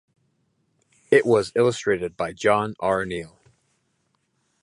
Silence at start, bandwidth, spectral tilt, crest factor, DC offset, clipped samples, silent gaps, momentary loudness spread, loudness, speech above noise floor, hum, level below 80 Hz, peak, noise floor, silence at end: 1.1 s; 11.5 kHz; -5.5 dB/octave; 20 dB; under 0.1%; under 0.1%; none; 12 LU; -22 LUFS; 49 dB; none; -58 dBFS; -4 dBFS; -71 dBFS; 1.35 s